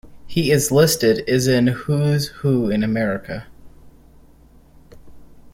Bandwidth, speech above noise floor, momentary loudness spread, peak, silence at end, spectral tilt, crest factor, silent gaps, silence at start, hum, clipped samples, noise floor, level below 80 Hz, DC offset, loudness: 16.5 kHz; 31 dB; 10 LU; -2 dBFS; 0.05 s; -5.5 dB/octave; 18 dB; none; 0.05 s; none; under 0.1%; -48 dBFS; -46 dBFS; under 0.1%; -18 LUFS